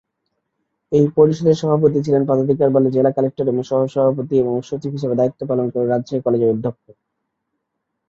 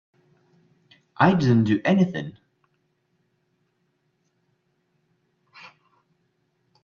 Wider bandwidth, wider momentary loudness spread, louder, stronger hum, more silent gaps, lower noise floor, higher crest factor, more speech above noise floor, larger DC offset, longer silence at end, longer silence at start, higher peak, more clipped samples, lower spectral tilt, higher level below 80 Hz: about the same, 7.6 kHz vs 7 kHz; second, 7 LU vs 13 LU; first, -18 LUFS vs -21 LUFS; neither; neither; first, -76 dBFS vs -71 dBFS; second, 16 dB vs 26 dB; first, 59 dB vs 52 dB; neither; second, 1.35 s vs 4.55 s; second, 0.9 s vs 1.2 s; about the same, -2 dBFS vs -2 dBFS; neither; about the same, -9 dB/octave vs -8 dB/octave; about the same, -58 dBFS vs -62 dBFS